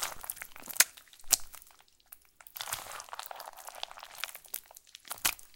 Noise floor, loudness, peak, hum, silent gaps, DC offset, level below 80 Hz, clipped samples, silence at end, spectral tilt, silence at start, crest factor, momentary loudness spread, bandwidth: -60 dBFS; -33 LUFS; -2 dBFS; none; none; under 0.1%; -62 dBFS; under 0.1%; 0 s; 2 dB/octave; 0 s; 36 dB; 25 LU; 17 kHz